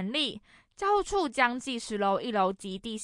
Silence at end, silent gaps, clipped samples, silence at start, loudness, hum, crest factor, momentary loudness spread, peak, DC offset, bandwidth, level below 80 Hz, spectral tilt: 0 s; none; under 0.1%; 0 s; -29 LUFS; none; 20 dB; 9 LU; -10 dBFS; under 0.1%; 11.5 kHz; -56 dBFS; -3.5 dB/octave